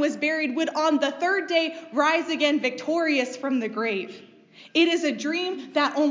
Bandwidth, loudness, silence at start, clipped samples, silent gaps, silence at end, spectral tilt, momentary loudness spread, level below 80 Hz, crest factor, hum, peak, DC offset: 7.6 kHz; -24 LUFS; 0 s; under 0.1%; none; 0 s; -3 dB/octave; 5 LU; -88 dBFS; 16 dB; none; -8 dBFS; under 0.1%